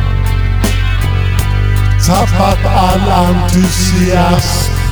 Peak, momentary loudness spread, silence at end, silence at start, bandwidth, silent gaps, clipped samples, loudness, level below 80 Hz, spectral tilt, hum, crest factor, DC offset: 0 dBFS; 3 LU; 0 s; 0 s; over 20 kHz; none; under 0.1%; -11 LUFS; -16 dBFS; -5.5 dB/octave; none; 10 dB; under 0.1%